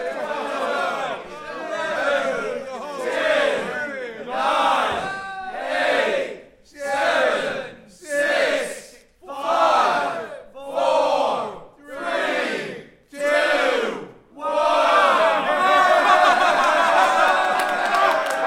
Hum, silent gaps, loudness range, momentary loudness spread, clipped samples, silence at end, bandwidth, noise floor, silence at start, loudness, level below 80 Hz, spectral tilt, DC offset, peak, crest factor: none; none; 7 LU; 15 LU; under 0.1%; 0 s; 16 kHz; -45 dBFS; 0 s; -20 LUFS; -58 dBFS; -2.5 dB/octave; under 0.1%; -4 dBFS; 18 dB